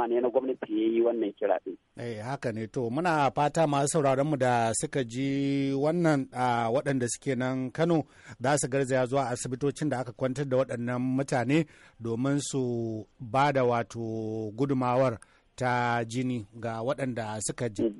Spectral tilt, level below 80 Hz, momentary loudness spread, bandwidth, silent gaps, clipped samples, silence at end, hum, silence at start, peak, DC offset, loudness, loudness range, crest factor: -5.5 dB/octave; -62 dBFS; 8 LU; 11.5 kHz; none; under 0.1%; 0 s; none; 0 s; -12 dBFS; under 0.1%; -29 LUFS; 3 LU; 16 dB